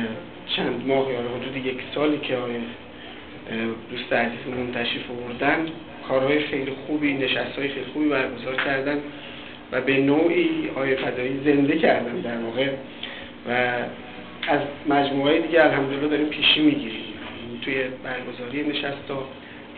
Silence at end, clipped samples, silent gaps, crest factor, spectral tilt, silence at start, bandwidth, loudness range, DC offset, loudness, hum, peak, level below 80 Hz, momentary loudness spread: 0 s; under 0.1%; none; 20 dB; -9 dB/octave; 0 s; 4.6 kHz; 6 LU; 0.3%; -24 LUFS; none; -4 dBFS; -58 dBFS; 15 LU